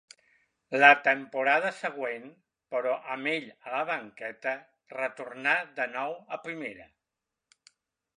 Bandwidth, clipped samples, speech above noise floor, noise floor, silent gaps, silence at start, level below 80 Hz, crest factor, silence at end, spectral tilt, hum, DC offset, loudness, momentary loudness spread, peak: 10.5 kHz; under 0.1%; 59 dB; -87 dBFS; none; 0.7 s; -82 dBFS; 28 dB; 1.35 s; -4 dB/octave; none; under 0.1%; -28 LUFS; 18 LU; -2 dBFS